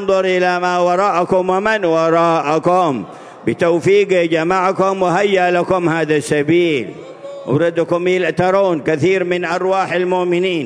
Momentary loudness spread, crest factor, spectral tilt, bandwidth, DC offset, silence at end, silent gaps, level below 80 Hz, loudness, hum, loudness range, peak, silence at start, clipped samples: 5 LU; 14 dB; -6 dB/octave; 11 kHz; under 0.1%; 0 s; none; -54 dBFS; -15 LUFS; none; 2 LU; -2 dBFS; 0 s; under 0.1%